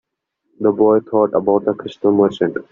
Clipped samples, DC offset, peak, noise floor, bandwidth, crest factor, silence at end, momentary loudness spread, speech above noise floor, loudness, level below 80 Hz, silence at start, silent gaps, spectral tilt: under 0.1%; under 0.1%; -2 dBFS; -71 dBFS; 7.2 kHz; 14 dB; 0.1 s; 6 LU; 56 dB; -16 LUFS; -60 dBFS; 0.6 s; none; -6.5 dB/octave